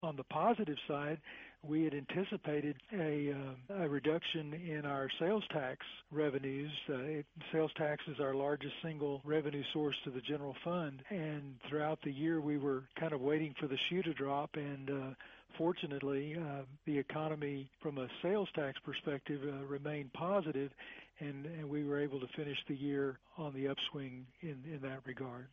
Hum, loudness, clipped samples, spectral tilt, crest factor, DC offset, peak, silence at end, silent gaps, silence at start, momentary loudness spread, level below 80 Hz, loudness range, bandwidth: none; -40 LUFS; under 0.1%; -4.5 dB/octave; 18 dB; under 0.1%; -22 dBFS; 0.05 s; none; 0 s; 9 LU; -74 dBFS; 3 LU; 6.8 kHz